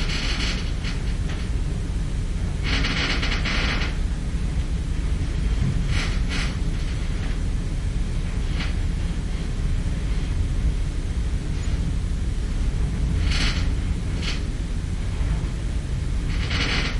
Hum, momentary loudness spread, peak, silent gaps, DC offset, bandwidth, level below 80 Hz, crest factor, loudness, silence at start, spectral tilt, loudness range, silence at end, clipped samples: none; 5 LU; -8 dBFS; none; under 0.1%; 11.5 kHz; -24 dBFS; 14 dB; -26 LUFS; 0 s; -5 dB/octave; 2 LU; 0 s; under 0.1%